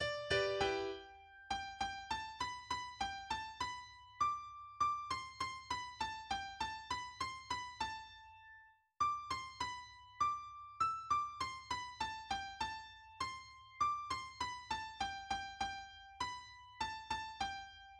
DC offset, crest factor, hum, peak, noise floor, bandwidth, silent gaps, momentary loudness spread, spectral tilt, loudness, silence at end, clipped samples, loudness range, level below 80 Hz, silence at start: under 0.1%; 20 dB; none; -22 dBFS; -64 dBFS; 12 kHz; none; 13 LU; -2.5 dB/octave; -42 LUFS; 0 s; under 0.1%; 3 LU; -64 dBFS; 0 s